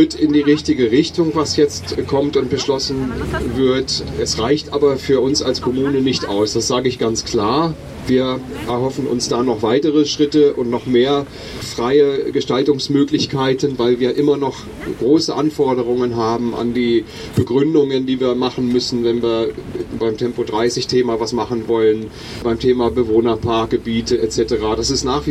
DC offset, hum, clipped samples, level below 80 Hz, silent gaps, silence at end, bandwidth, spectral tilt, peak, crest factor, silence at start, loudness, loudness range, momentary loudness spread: under 0.1%; none; under 0.1%; -40 dBFS; none; 0 s; 13.5 kHz; -5 dB/octave; -2 dBFS; 14 dB; 0 s; -17 LUFS; 2 LU; 6 LU